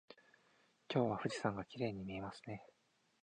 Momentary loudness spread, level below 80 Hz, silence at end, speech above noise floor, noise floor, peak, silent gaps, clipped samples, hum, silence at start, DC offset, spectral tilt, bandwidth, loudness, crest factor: 14 LU; -72 dBFS; 0.55 s; 33 dB; -74 dBFS; -20 dBFS; none; under 0.1%; none; 0.1 s; under 0.1%; -6 dB/octave; 10 kHz; -42 LUFS; 22 dB